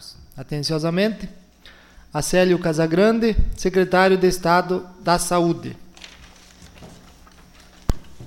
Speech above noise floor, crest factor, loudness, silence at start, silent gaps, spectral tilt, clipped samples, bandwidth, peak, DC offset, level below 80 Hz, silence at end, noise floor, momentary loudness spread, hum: 29 dB; 18 dB; -20 LUFS; 0 s; none; -5 dB/octave; under 0.1%; 17 kHz; -4 dBFS; under 0.1%; -32 dBFS; 0 s; -48 dBFS; 22 LU; none